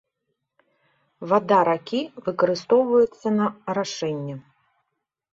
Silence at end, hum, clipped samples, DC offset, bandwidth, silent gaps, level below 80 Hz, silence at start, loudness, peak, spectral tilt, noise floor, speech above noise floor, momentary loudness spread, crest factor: 0.9 s; none; under 0.1%; under 0.1%; 7.8 kHz; none; -68 dBFS; 1.2 s; -22 LUFS; -6 dBFS; -6 dB/octave; -80 dBFS; 58 dB; 12 LU; 18 dB